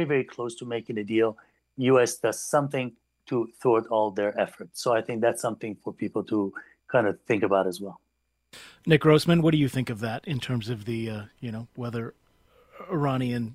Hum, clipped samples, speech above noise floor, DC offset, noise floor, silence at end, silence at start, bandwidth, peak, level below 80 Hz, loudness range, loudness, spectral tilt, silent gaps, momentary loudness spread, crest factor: none; under 0.1%; 35 dB; under 0.1%; -61 dBFS; 0 s; 0 s; 15.5 kHz; -4 dBFS; -62 dBFS; 5 LU; -26 LUFS; -6 dB/octave; none; 14 LU; 22 dB